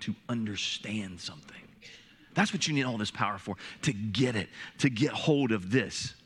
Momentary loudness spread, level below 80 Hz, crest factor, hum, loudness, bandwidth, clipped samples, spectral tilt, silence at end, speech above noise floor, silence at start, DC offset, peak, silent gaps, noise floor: 16 LU; -68 dBFS; 20 dB; none; -31 LUFS; 12 kHz; under 0.1%; -4.5 dB/octave; 0.1 s; 23 dB; 0 s; under 0.1%; -10 dBFS; none; -54 dBFS